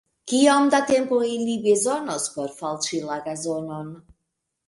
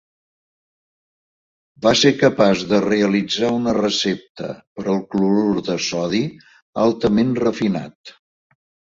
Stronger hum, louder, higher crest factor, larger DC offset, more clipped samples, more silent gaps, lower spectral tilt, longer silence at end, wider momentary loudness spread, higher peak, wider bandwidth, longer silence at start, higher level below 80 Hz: neither; second, -22 LUFS vs -18 LUFS; about the same, 20 dB vs 18 dB; neither; neither; second, none vs 4.29-4.35 s, 4.67-4.76 s, 6.62-6.73 s, 7.95-8.04 s; second, -3.5 dB/octave vs -5 dB/octave; second, 0.65 s vs 0.8 s; about the same, 12 LU vs 13 LU; about the same, -4 dBFS vs -2 dBFS; first, 11.5 kHz vs 7.8 kHz; second, 0.25 s vs 1.8 s; second, -66 dBFS vs -54 dBFS